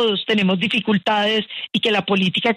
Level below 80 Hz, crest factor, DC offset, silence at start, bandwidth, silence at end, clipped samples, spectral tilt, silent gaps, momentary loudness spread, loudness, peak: -62 dBFS; 12 dB; under 0.1%; 0 s; 10.5 kHz; 0 s; under 0.1%; -5.5 dB/octave; none; 3 LU; -18 LUFS; -6 dBFS